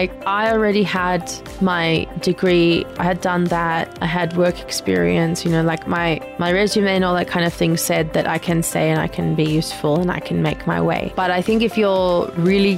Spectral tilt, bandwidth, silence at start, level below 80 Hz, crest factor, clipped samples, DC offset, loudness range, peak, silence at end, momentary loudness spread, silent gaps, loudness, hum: -5.5 dB/octave; 16 kHz; 0 s; -40 dBFS; 14 dB; under 0.1%; under 0.1%; 1 LU; -4 dBFS; 0 s; 4 LU; none; -18 LUFS; none